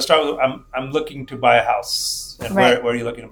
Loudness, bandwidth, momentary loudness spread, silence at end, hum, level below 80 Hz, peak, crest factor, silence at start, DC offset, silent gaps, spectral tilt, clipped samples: -19 LUFS; over 20 kHz; 10 LU; 0.05 s; none; -48 dBFS; 0 dBFS; 20 dB; 0 s; under 0.1%; none; -3.5 dB/octave; under 0.1%